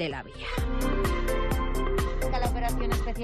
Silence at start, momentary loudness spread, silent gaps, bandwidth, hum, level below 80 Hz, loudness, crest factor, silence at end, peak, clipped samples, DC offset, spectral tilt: 0 s; 4 LU; none; 14.5 kHz; none; -30 dBFS; -30 LUFS; 12 dB; 0 s; -16 dBFS; under 0.1%; under 0.1%; -5.5 dB/octave